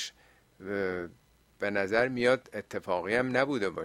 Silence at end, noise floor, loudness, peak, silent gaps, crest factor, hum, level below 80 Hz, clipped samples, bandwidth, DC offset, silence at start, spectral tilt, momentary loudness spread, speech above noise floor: 0 s; -62 dBFS; -30 LUFS; -10 dBFS; none; 22 dB; none; -64 dBFS; under 0.1%; 13.5 kHz; under 0.1%; 0 s; -5 dB/octave; 12 LU; 32 dB